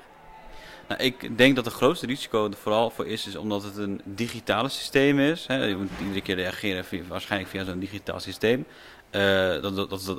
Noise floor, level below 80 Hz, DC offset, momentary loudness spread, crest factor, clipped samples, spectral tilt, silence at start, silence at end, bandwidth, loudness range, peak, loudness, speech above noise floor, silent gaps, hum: -47 dBFS; -56 dBFS; under 0.1%; 12 LU; 24 dB; under 0.1%; -5 dB/octave; 0 s; 0 s; 16 kHz; 4 LU; -2 dBFS; -26 LUFS; 21 dB; none; none